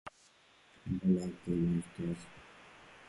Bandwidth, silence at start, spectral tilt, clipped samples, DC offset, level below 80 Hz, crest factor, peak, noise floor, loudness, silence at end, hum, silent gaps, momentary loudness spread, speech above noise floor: 11.5 kHz; 0.05 s; -8 dB/octave; under 0.1%; under 0.1%; -58 dBFS; 18 dB; -20 dBFS; -65 dBFS; -35 LUFS; 0.05 s; none; none; 23 LU; 31 dB